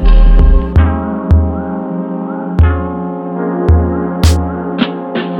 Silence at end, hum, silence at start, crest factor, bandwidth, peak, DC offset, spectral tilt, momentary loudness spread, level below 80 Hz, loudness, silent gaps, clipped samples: 0 s; none; 0 s; 10 dB; 10.5 kHz; 0 dBFS; under 0.1%; -7.5 dB/octave; 9 LU; -12 dBFS; -14 LUFS; none; under 0.1%